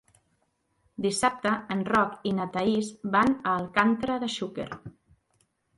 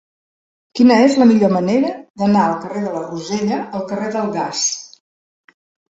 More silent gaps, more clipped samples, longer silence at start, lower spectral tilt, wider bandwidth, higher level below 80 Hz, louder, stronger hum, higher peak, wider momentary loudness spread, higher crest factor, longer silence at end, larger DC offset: second, none vs 2.10-2.14 s; neither; first, 1 s vs 0.75 s; about the same, -4.5 dB/octave vs -5 dB/octave; first, 11.5 kHz vs 8 kHz; about the same, -60 dBFS vs -60 dBFS; second, -27 LUFS vs -16 LUFS; neither; second, -8 dBFS vs -2 dBFS; about the same, 10 LU vs 12 LU; first, 22 dB vs 16 dB; second, 0.9 s vs 1.05 s; neither